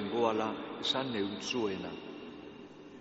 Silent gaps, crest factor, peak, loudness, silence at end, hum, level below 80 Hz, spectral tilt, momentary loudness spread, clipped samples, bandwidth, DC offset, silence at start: none; 20 dB; -16 dBFS; -34 LUFS; 0 s; none; -70 dBFS; -2.5 dB/octave; 18 LU; under 0.1%; 8 kHz; under 0.1%; 0 s